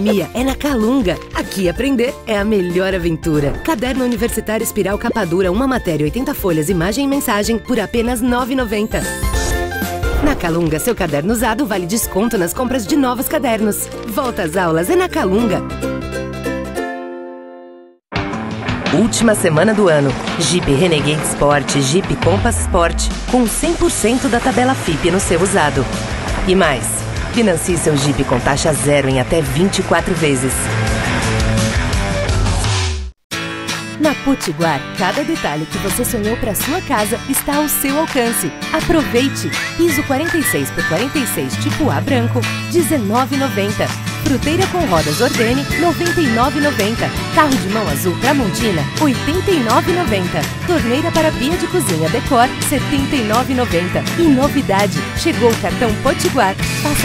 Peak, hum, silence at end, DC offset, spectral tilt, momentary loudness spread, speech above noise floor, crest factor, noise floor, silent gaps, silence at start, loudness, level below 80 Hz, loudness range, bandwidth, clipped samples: 0 dBFS; none; 0 s; under 0.1%; -4.5 dB/octave; 6 LU; 25 dB; 16 dB; -40 dBFS; 33.24-33.30 s; 0 s; -16 LUFS; -30 dBFS; 3 LU; 16.5 kHz; under 0.1%